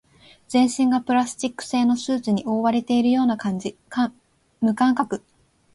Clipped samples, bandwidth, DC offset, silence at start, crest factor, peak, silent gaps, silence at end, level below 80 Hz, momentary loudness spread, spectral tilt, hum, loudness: under 0.1%; 11.5 kHz; under 0.1%; 0.5 s; 14 dB; -8 dBFS; none; 0.55 s; -62 dBFS; 8 LU; -5 dB/octave; none; -22 LUFS